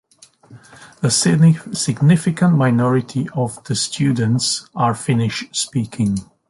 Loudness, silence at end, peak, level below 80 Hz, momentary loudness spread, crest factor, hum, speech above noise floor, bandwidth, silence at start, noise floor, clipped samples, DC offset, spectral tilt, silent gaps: -17 LUFS; 0.25 s; -2 dBFS; -52 dBFS; 8 LU; 16 dB; none; 32 dB; 11.5 kHz; 0.5 s; -48 dBFS; under 0.1%; under 0.1%; -5 dB/octave; none